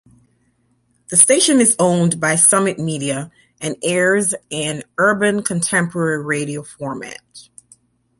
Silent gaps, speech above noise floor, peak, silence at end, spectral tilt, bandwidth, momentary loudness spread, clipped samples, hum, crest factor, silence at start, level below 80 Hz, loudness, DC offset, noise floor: none; 45 dB; 0 dBFS; 0.8 s; -3.5 dB/octave; 16 kHz; 16 LU; under 0.1%; none; 18 dB; 1.1 s; -60 dBFS; -16 LUFS; under 0.1%; -62 dBFS